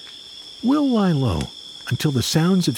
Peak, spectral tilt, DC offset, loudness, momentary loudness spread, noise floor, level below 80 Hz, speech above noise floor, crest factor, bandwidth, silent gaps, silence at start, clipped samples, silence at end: -6 dBFS; -5.5 dB/octave; under 0.1%; -20 LUFS; 17 LU; -39 dBFS; -44 dBFS; 20 dB; 14 dB; 17.5 kHz; none; 0 s; under 0.1%; 0 s